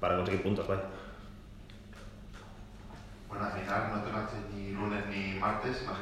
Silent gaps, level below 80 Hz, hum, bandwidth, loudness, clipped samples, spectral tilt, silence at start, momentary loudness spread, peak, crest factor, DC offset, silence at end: none; -52 dBFS; none; 14 kHz; -35 LUFS; under 0.1%; -6.5 dB/octave; 0 s; 19 LU; -18 dBFS; 18 dB; under 0.1%; 0 s